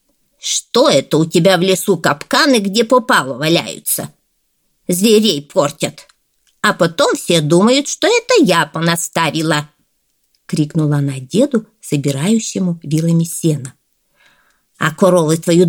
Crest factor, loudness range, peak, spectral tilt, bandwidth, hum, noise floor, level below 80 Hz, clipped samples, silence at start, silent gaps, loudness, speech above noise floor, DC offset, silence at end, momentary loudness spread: 14 dB; 5 LU; 0 dBFS; -4.5 dB/octave; 19.5 kHz; none; -64 dBFS; -60 dBFS; under 0.1%; 0.45 s; none; -14 LUFS; 50 dB; under 0.1%; 0 s; 8 LU